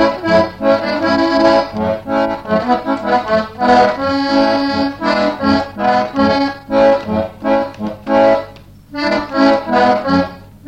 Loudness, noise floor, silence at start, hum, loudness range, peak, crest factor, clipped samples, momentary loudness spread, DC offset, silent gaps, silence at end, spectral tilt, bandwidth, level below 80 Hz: -14 LUFS; -37 dBFS; 0 s; none; 1 LU; 0 dBFS; 14 dB; under 0.1%; 6 LU; 0.2%; none; 0 s; -6 dB/octave; 9 kHz; -42 dBFS